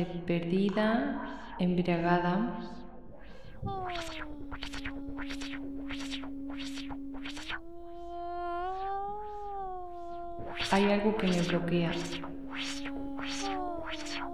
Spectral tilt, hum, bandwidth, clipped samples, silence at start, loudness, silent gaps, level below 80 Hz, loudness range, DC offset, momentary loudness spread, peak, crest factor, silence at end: -5.5 dB/octave; none; 13 kHz; under 0.1%; 0 s; -34 LUFS; none; -50 dBFS; 8 LU; 0.6%; 14 LU; -14 dBFS; 20 dB; 0 s